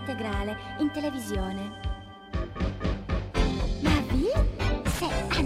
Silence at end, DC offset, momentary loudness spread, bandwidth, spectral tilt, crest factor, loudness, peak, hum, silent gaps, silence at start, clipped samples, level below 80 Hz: 0 s; under 0.1%; 10 LU; 15.5 kHz; -6 dB/octave; 18 dB; -29 LUFS; -10 dBFS; none; none; 0 s; under 0.1%; -32 dBFS